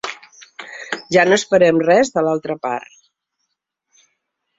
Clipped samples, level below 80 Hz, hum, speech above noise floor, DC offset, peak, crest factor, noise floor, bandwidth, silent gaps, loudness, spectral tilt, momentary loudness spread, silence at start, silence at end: under 0.1%; -60 dBFS; none; 60 dB; under 0.1%; 0 dBFS; 18 dB; -75 dBFS; 7.8 kHz; none; -16 LUFS; -4.5 dB/octave; 20 LU; 0.05 s; 1.8 s